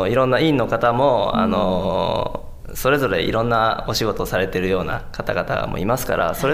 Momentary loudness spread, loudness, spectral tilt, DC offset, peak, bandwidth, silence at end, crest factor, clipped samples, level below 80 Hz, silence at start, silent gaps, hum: 8 LU; -20 LUFS; -5.5 dB/octave; under 0.1%; -4 dBFS; 16 kHz; 0 s; 14 dB; under 0.1%; -36 dBFS; 0 s; none; none